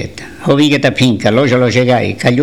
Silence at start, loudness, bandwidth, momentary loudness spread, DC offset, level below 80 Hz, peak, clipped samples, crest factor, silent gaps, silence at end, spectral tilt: 0 s; -11 LUFS; 14.5 kHz; 4 LU; 1%; -44 dBFS; 0 dBFS; under 0.1%; 12 dB; none; 0 s; -6 dB/octave